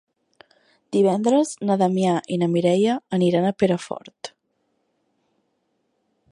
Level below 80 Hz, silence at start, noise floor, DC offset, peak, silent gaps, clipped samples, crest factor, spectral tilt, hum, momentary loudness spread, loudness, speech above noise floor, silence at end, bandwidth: -66 dBFS; 0.9 s; -71 dBFS; under 0.1%; -6 dBFS; none; under 0.1%; 18 dB; -6.5 dB/octave; none; 15 LU; -21 LUFS; 51 dB; 2.05 s; 11 kHz